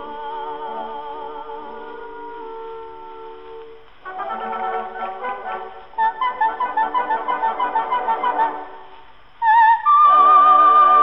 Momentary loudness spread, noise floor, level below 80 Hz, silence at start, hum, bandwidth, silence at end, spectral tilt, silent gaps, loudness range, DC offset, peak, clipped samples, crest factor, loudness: 24 LU; -46 dBFS; -58 dBFS; 0 s; none; 5.4 kHz; 0 s; -6 dB/octave; none; 18 LU; 0.8%; -2 dBFS; under 0.1%; 16 dB; -17 LUFS